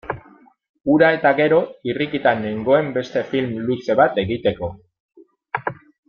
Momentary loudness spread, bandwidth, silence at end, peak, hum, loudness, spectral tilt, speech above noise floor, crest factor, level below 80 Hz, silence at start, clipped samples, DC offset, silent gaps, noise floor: 14 LU; 7 kHz; 0.35 s; -2 dBFS; none; -19 LUFS; -7.5 dB/octave; 32 dB; 18 dB; -54 dBFS; 0.05 s; under 0.1%; under 0.1%; 0.69-0.74 s, 5.00-5.09 s; -50 dBFS